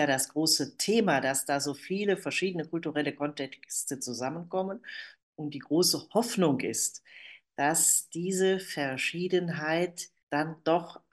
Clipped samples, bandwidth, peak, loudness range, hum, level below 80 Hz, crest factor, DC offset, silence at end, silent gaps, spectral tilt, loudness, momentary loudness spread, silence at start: under 0.1%; 13 kHz; -10 dBFS; 5 LU; none; -78 dBFS; 20 dB; under 0.1%; 0.15 s; 5.23-5.33 s, 10.23-10.27 s; -3 dB/octave; -29 LUFS; 14 LU; 0 s